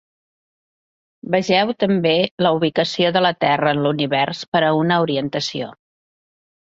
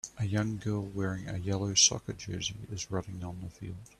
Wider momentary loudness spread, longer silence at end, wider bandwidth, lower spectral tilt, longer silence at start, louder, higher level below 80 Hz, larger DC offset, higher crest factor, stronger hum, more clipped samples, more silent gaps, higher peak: second, 7 LU vs 18 LU; first, 0.95 s vs 0.15 s; second, 8 kHz vs 13 kHz; first, -5.5 dB/octave vs -3 dB/octave; first, 1.25 s vs 0.05 s; first, -18 LUFS vs -31 LUFS; about the same, -60 dBFS vs -58 dBFS; neither; second, 16 dB vs 24 dB; neither; neither; first, 2.31-2.38 s, 4.48-4.52 s vs none; first, -2 dBFS vs -10 dBFS